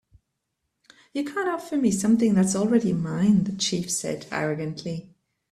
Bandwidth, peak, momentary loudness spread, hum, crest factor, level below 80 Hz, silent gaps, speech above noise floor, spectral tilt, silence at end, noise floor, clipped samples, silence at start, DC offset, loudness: 13.5 kHz; -8 dBFS; 11 LU; none; 16 dB; -60 dBFS; none; 56 dB; -5 dB/octave; 0.5 s; -79 dBFS; under 0.1%; 1.15 s; under 0.1%; -24 LUFS